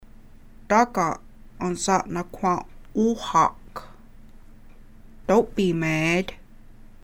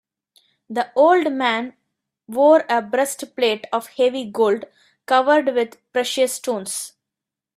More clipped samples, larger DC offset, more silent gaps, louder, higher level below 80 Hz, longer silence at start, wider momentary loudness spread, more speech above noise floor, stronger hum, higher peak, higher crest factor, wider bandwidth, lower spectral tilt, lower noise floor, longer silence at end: neither; neither; neither; second, -23 LUFS vs -19 LUFS; first, -46 dBFS vs -72 dBFS; second, 0.05 s vs 0.7 s; first, 15 LU vs 11 LU; second, 23 dB vs 67 dB; neither; second, -6 dBFS vs -2 dBFS; about the same, 20 dB vs 18 dB; about the same, 16.5 kHz vs 15.5 kHz; first, -5 dB/octave vs -2.5 dB/octave; second, -46 dBFS vs -86 dBFS; second, 0.1 s vs 0.65 s